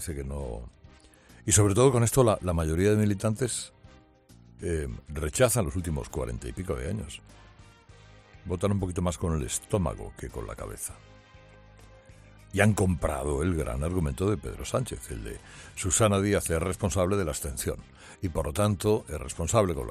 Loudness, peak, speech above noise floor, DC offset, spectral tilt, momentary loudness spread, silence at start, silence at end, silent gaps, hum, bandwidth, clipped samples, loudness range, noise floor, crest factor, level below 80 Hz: -28 LUFS; -6 dBFS; 28 dB; under 0.1%; -5 dB/octave; 15 LU; 0 s; 0 s; none; none; 15 kHz; under 0.1%; 8 LU; -56 dBFS; 22 dB; -42 dBFS